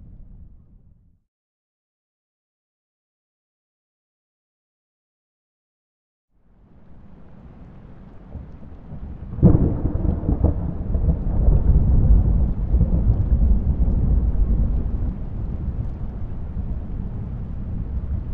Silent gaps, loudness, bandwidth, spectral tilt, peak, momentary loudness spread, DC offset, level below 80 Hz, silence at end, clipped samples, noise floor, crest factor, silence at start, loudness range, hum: 1.28-6.28 s; -22 LUFS; 2.1 kHz; -13.5 dB/octave; -4 dBFS; 19 LU; under 0.1%; -24 dBFS; 0 s; under 0.1%; -53 dBFS; 18 dB; 0 s; 10 LU; none